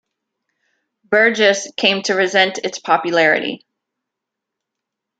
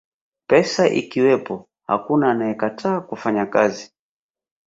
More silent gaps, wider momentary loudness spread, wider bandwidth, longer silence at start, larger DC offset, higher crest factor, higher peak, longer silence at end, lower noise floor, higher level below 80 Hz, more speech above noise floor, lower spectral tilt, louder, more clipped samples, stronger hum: neither; about the same, 8 LU vs 7 LU; first, 9.2 kHz vs 7.8 kHz; first, 1.1 s vs 0.5 s; neither; about the same, 18 dB vs 20 dB; about the same, 0 dBFS vs 0 dBFS; first, 1.65 s vs 0.8 s; second, -82 dBFS vs under -90 dBFS; second, -72 dBFS vs -62 dBFS; second, 66 dB vs over 71 dB; second, -2.5 dB/octave vs -5.5 dB/octave; first, -15 LUFS vs -20 LUFS; neither; neither